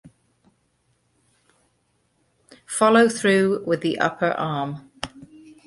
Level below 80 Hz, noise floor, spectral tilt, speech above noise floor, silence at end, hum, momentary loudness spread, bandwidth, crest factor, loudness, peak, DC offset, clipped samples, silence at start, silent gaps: -62 dBFS; -68 dBFS; -4.5 dB/octave; 48 dB; 0.4 s; none; 18 LU; 11.5 kHz; 20 dB; -21 LUFS; -4 dBFS; under 0.1%; under 0.1%; 0.05 s; none